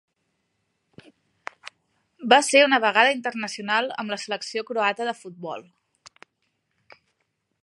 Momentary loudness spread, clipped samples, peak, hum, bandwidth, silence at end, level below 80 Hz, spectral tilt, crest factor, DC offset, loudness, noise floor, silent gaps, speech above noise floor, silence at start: 22 LU; under 0.1%; 0 dBFS; none; 11.5 kHz; 2 s; -80 dBFS; -2 dB/octave; 24 dB; under 0.1%; -21 LUFS; -75 dBFS; none; 53 dB; 1.65 s